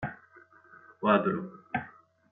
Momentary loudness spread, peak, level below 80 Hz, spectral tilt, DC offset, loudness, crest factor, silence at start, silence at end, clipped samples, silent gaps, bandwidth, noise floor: 21 LU; -10 dBFS; -68 dBFS; -9.5 dB/octave; under 0.1%; -30 LUFS; 24 dB; 0 s; 0.4 s; under 0.1%; none; 4 kHz; -58 dBFS